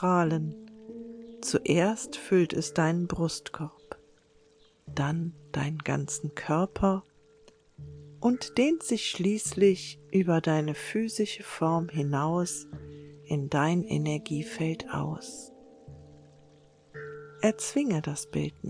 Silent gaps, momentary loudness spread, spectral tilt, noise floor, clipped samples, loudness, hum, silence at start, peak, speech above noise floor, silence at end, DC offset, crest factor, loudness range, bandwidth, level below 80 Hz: none; 19 LU; -5.5 dB/octave; -62 dBFS; under 0.1%; -29 LUFS; none; 0 s; -10 dBFS; 33 dB; 0 s; under 0.1%; 18 dB; 6 LU; 10.5 kHz; -58 dBFS